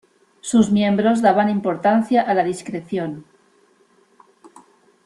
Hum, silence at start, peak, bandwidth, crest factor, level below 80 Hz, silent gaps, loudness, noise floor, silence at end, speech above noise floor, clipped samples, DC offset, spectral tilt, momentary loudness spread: none; 0.45 s; -2 dBFS; 11.5 kHz; 18 dB; -60 dBFS; none; -19 LUFS; -57 dBFS; 1.85 s; 40 dB; under 0.1%; under 0.1%; -6 dB/octave; 13 LU